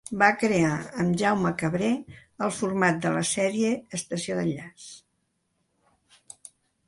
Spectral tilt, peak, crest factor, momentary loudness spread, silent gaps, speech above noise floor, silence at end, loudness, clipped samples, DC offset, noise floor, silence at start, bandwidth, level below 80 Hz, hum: -5 dB/octave; -4 dBFS; 22 dB; 21 LU; none; 49 dB; 1.9 s; -26 LUFS; under 0.1%; under 0.1%; -75 dBFS; 0.1 s; 11.5 kHz; -62 dBFS; none